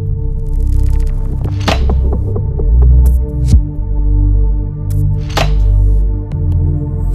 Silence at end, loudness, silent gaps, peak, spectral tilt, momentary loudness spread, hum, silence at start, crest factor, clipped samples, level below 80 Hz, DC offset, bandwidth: 0 s; -14 LUFS; none; 0 dBFS; -7 dB/octave; 7 LU; none; 0 s; 10 dB; 0.2%; -12 dBFS; under 0.1%; 8.4 kHz